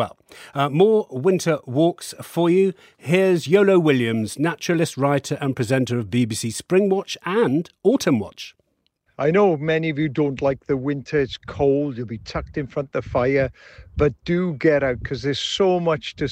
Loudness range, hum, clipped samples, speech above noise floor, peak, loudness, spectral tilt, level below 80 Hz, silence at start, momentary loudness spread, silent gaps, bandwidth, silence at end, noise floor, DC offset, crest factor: 4 LU; none; under 0.1%; 48 dB; -4 dBFS; -21 LUFS; -6 dB/octave; -46 dBFS; 0 s; 10 LU; none; 16 kHz; 0 s; -68 dBFS; under 0.1%; 18 dB